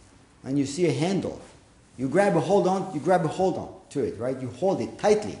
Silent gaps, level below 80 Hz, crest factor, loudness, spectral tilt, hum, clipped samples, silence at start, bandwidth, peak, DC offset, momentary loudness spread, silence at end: none; -58 dBFS; 18 dB; -25 LUFS; -6 dB/octave; none; under 0.1%; 0.45 s; 11 kHz; -8 dBFS; under 0.1%; 12 LU; 0 s